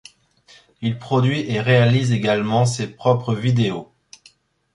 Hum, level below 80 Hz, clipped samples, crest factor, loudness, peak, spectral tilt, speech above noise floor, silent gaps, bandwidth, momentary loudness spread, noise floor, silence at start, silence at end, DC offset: none; -56 dBFS; under 0.1%; 18 dB; -19 LUFS; -2 dBFS; -6.5 dB/octave; 36 dB; none; 11.5 kHz; 10 LU; -54 dBFS; 0.8 s; 0.9 s; under 0.1%